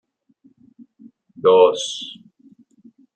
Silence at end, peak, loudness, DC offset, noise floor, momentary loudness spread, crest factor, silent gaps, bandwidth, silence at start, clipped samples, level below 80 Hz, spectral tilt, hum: 1 s; -2 dBFS; -17 LUFS; under 0.1%; -57 dBFS; 18 LU; 20 dB; none; 9 kHz; 1.45 s; under 0.1%; -74 dBFS; -3 dB/octave; none